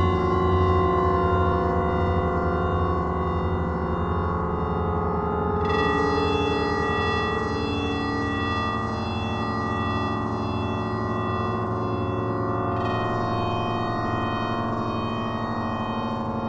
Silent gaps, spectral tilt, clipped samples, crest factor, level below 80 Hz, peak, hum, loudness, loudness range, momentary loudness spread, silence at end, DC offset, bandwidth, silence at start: none; -7.5 dB/octave; under 0.1%; 16 dB; -36 dBFS; -8 dBFS; none; -25 LUFS; 3 LU; 5 LU; 0 s; under 0.1%; 8.4 kHz; 0 s